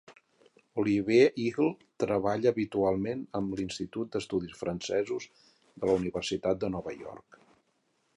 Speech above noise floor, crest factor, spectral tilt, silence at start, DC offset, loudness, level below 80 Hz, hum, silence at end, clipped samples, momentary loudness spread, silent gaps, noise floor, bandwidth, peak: 44 dB; 20 dB; -6 dB/octave; 0.1 s; under 0.1%; -30 LUFS; -60 dBFS; none; 1 s; under 0.1%; 12 LU; none; -74 dBFS; 11 kHz; -10 dBFS